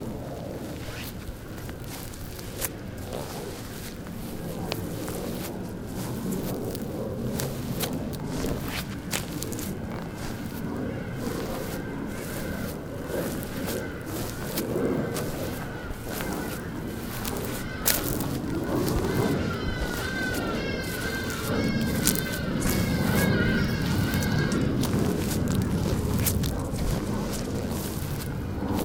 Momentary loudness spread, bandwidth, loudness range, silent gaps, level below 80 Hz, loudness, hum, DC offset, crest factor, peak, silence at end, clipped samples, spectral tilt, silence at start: 10 LU; 19 kHz; 9 LU; none; -40 dBFS; -29 LUFS; none; under 0.1%; 28 dB; 0 dBFS; 0 s; under 0.1%; -5 dB/octave; 0 s